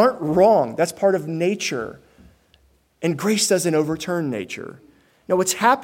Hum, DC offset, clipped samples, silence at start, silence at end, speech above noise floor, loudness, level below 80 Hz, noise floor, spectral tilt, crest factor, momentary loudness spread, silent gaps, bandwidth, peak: none; under 0.1%; under 0.1%; 0 s; 0 s; 39 dB; -20 LUFS; -58 dBFS; -59 dBFS; -4 dB/octave; 18 dB; 13 LU; none; 16.5 kHz; -2 dBFS